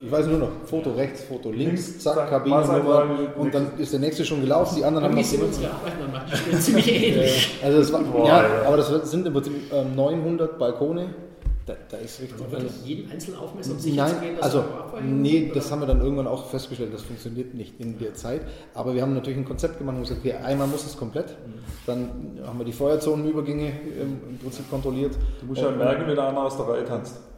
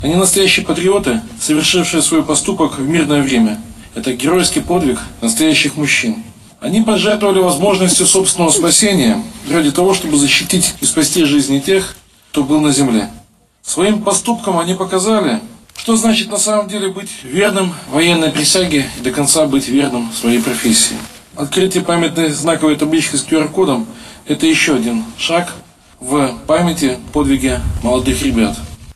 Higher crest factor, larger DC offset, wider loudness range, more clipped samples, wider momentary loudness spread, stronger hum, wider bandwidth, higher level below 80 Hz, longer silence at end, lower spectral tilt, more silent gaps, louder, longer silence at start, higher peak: first, 22 dB vs 14 dB; neither; first, 10 LU vs 4 LU; neither; first, 15 LU vs 9 LU; neither; first, 16.5 kHz vs 14.5 kHz; about the same, -38 dBFS vs -36 dBFS; about the same, 0 s vs 0.05 s; first, -5.5 dB/octave vs -3.5 dB/octave; neither; second, -24 LUFS vs -13 LUFS; about the same, 0 s vs 0 s; about the same, -2 dBFS vs 0 dBFS